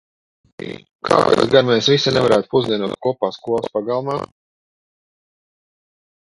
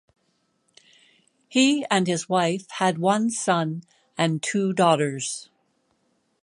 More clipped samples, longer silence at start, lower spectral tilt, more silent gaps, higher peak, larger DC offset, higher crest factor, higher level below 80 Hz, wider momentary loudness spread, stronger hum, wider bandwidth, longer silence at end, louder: neither; second, 0.6 s vs 1.5 s; about the same, -5 dB/octave vs -4.5 dB/octave; first, 0.95-0.99 s vs none; first, 0 dBFS vs -4 dBFS; neither; about the same, 20 dB vs 20 dB; first, -54 dBFS vs -74 dBFS; first, 19 LU vs 10 LU; neither; about the same, 11.5 kHz vs 11 kHz; first, 2.15 s vs 1 s; first, -17 LUFS vs -23 LUFS